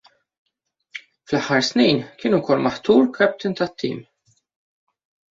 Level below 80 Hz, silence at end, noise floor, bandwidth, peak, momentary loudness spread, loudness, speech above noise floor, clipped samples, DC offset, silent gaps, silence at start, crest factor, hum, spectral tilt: -60 dBFS; 1.3 s; -42 dBFS; 7.6 kHz; -2 dBFS; 20 LU; -20 LUFS; 23 dB; under 0.1%; under 0.1%; none; 0.95 s; 20 dB; none; -5 dB/octave